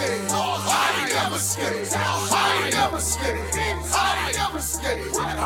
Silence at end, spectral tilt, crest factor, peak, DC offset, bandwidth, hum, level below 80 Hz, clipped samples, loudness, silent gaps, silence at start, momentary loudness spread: 0 s; -2.5 dB/octave; 16 dB; -6 dBFS; under 0.1%; 17.5 kHz; none; -38 dBFS; under 0.1%; -22 LUFS; none; 0 s; 5 LU